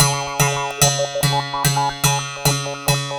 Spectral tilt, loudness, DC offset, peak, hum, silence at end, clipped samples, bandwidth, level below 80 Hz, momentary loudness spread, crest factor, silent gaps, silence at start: -3 dB/octave; -18 LUFS; under 0.1%; 0 dBFS; none; 0 s; under 0.1%; over 20 kHz; -42 dBFS; 3 LU; 20 dB; none; 0 s